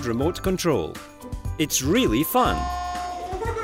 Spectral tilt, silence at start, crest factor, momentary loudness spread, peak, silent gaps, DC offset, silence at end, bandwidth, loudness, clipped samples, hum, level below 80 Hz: -4.5 dB/octave; 0 s; 16 dB; 13 LU; -8 dBFS; none; under 0.1%; 0 s; 16 kHz; -24 LUFS; under 0.1%; none; -36 dBFS